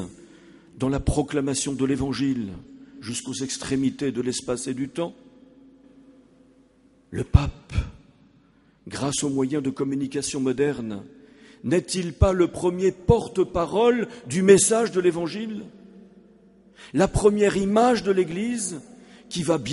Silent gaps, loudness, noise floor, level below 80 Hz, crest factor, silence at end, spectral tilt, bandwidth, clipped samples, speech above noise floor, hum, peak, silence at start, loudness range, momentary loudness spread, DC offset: none; -24 LUFS; -58 dBFS; -38 dBFS; 24 dB; 0 s; -5 dB/octave; 11.5 kHz; under 0.1%; 35 dB; none; 0 dBFS; 0 s; 9 LU; 14 LU; under 0.1%